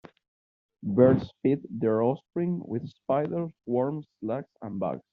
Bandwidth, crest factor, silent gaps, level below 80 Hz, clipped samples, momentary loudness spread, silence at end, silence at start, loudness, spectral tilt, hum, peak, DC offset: 5.4 kHz; 20 dB; none; -62 dBFS; under 0.1%; 13 LU; 0.15 s; 0.85 s; -28 LUFS; -9 dB/octave; none; -8 dBFS; under 0.1%